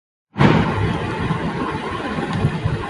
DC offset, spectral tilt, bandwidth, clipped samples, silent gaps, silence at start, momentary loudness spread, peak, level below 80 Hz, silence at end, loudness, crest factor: under 0.1%; -7.5 dB/octave; 11.5 kHz; under 0.1%; none; 0.35 s; 9 LU; -2 dBFS; -36 dBFS; 0 s; -20 LUFS; 18 dB